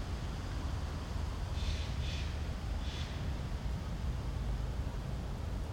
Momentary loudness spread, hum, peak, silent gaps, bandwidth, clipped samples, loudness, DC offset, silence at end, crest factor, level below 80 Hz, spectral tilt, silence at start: 3 LU; none; -26 dBFS; none; 16 kHz; under 0.1%; -40 LUFS; under 0.1%; 0 s; 12 dB; -40 dBFS; -6 dB/octave; 0 s